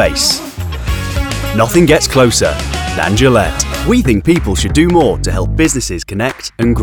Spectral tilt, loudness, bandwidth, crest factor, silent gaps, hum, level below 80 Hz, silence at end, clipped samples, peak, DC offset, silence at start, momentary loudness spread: -4.5 dB/octave; -12 LUFS; over 20 kHz; 12 dB; none; none; -22 dBFS; 0 s; under 0.1%; 0 dBFS; under 0.1%; 0 s; 9 LU